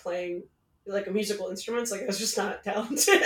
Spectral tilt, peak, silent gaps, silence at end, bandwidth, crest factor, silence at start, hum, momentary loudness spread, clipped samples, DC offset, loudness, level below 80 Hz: -2 dB/octave; -6 dBFS; none; 0 s; 18 kHz; 22 dB; 0.05 s; none; 9 LU; under 0.1%; under 0.1%; -29 LUFS; -68 dBFS